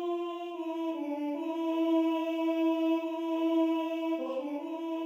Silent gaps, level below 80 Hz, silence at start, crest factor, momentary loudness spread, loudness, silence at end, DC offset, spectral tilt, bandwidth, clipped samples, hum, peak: none; under -90 dBFS; 0 s; 12 dB; 8 LU; -32 LUFS; 0 s; under 0.1%; -4 dB/octave; 16 kHz; under 0.1%; none; -18 dBFS